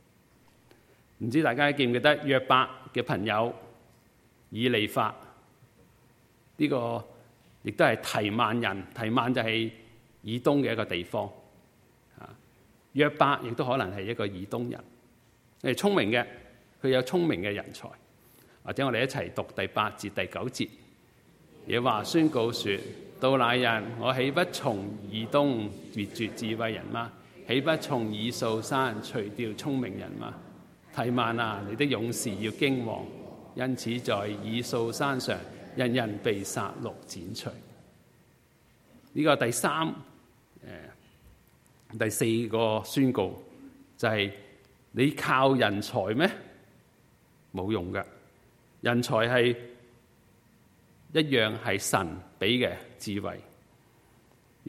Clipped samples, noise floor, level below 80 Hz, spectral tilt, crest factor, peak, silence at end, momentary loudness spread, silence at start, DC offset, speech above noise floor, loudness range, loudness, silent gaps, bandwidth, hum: under 0.1%; -62 dBFS; -66 dBFS; -5 dB/octave; 24 dB; -6 dBFS; 0 s; 15 LU; 1.2 s; under 0.1%; 34 dB; 5 LU; -29 LUFS; none; 16 kHz; none